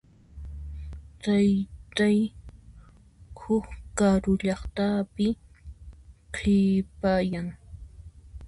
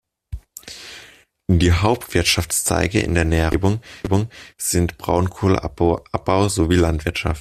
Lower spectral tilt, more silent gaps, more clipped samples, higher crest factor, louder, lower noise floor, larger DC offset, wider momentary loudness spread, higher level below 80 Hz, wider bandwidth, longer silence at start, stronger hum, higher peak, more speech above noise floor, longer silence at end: first, -6.5 dB/octave vs -5 dB/octave; neither; neither; about the same, 16 dB vs 18 dB; second, -26 LUFS vs -19 LUFS; first, -52 dBFS vs -47 dBFS; neither; first, 23 LU vs 18 LU; second, -44 dBFS vs -34 dBFS; second, 11 kHz vs 14.5 kHz; about the same, 0.35 s vs 0.3 s; neither; second, -10 dBFS vs -2 dBFS; about the same, 28 dB vs 29 dB; about the same, 0 s vs 0 s